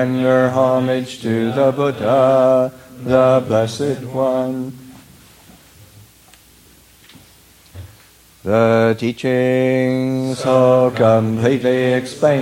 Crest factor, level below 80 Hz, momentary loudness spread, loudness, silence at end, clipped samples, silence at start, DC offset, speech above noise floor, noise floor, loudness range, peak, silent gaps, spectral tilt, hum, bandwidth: 16 dB; -54 dBFS; 8 LU; -16 LUFS; 0 s; under 0.1%; 0 s; under 0.1%; 32 dB; -48 dBFS; 11 LU; -2 dBFS; none; -7 dB/octave; none; 16.5 kHz